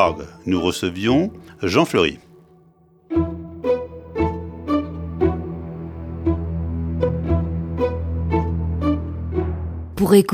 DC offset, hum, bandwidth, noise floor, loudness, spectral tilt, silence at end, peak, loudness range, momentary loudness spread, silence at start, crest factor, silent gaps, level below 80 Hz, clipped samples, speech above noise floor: under 0.1%; none; 16 kHz; -53 dBFS; -22 LUFS; -6.5 dB/octave; 0 s; -2 dBFS; 3 LU; 11 LU; 0 s; 20 dB; none; -32 dBFS; under 0.1%; 35 dB